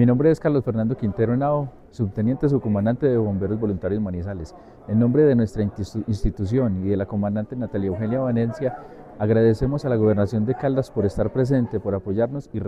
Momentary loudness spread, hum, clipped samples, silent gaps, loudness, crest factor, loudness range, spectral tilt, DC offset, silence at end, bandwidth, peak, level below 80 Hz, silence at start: 9 LU; none; under 0.1%; none; -22 LUFS; 16 dB; 2 LU; -9.5 dB/octave; under 0.1%; 0 s; 10 kHz; -6 dBFS; -40 dBFS; 0 s